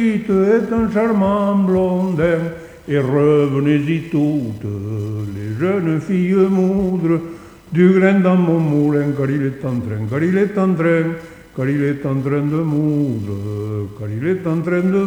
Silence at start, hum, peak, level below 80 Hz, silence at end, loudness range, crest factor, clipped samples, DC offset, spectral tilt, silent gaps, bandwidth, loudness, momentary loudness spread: 0 s; none; -2 dBFS; -48 dBFS; 0 s; 4 LU; 14 dB; under 0.1%; under 0.1%; -9 dB/octave; none; 9.8 kHz; -17 LUFS; 10 LU